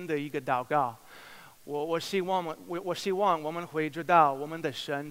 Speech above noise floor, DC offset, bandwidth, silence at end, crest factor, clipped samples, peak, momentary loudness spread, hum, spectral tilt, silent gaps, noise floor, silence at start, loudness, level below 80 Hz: 21 dB; under 0.1%; 16 kHz; 0 s; 22 dB; under 0.1%; -8 dBFS; 17 LU; none; -5 dB/octave; none; -51 dBFS; 0 s; -30 LUFS; -74 dBFS